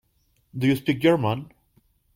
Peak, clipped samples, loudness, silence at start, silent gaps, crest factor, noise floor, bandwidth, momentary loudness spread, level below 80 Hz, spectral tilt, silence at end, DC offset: -8 dBFS; under 0.1%; -23 LUFS; 0.55 s; none; 18 dB; -67 dBFS; 16.5 kHz; 11 LU; -58 dBFS; -7 dB/octave; 0.7 s; under 0.1%